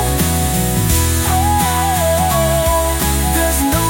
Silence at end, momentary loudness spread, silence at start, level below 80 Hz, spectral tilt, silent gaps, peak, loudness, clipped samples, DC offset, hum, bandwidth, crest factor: 0 s; 1 LU; 0 s; -22 dBFS; -4 dB/octave; none; -2 dBFS; -14 LUFS; under 0.1%; under 0.1%; none; 17 kHz; 12 dB